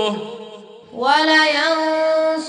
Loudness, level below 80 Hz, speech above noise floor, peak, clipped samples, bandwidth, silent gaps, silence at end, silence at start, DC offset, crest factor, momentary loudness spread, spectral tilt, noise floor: -16 LUFS; -72 dBFS; 22 dB; -2 dBFS; under 0.1%; 10.5 kHz; none; 0 s; 0 s; under 0.1%; 16 dB; 22 LU; -3 dB/octave; -39 dBFS